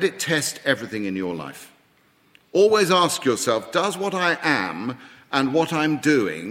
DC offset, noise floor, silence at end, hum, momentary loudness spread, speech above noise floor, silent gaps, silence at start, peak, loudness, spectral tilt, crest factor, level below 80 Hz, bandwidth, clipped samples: under 0.1%; -60 dBFS; 0 s; none; 11 LU; 38 dB; none; 0 s; -2 dBFS; -21 LUFS; -4 dB/octave; 20 dB; -68 dBFS; 16 kHz; under 0.1%